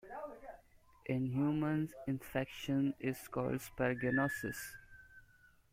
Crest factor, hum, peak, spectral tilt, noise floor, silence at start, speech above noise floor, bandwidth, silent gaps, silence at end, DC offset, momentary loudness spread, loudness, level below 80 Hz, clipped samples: 18 dB; none; -20 dBFS; -6.5 dB/octave; -66 dBFS; 0.05 s; 29 dB; 16.5 kHz; none; 0.5 s; under 0.1%; 17 LU; -38 LUFS; -64 dBFS; under 0.1%